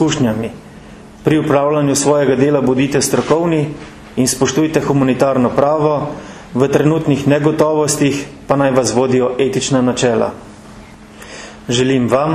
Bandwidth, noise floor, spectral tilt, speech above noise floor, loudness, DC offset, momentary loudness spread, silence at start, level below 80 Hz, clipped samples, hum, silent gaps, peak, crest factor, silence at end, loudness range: 14 kHz; -36 dBFS; -5 dB/octave; 23 dB; -14 LUFS; under 0.1%; 11 LU; 0 s; -44 dBFS; under 0.1%; none; none; 0 dBFS; 14 dB; 0 s; 2 LU